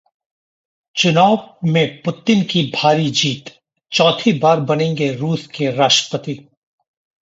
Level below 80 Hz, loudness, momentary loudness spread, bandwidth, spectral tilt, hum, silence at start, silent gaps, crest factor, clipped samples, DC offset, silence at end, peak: -60 dBFS; -16 LUFS; 10 LU; 8 kHz; -4.5 dB/octave; none; 0.95 s; none; 16 dB; under 0.1%; under 0.1%; 0.8 s; 0 dBFS